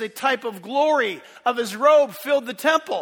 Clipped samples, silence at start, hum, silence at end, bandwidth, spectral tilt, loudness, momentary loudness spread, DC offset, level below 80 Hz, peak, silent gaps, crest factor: under 0.1%; 0 s; none; 0 s; over 20 kHz; -3 dB/octave; -21 LUFS; 10 LU; under 0.1%; -76 dBFS; -4 dBFS; none; 18 dB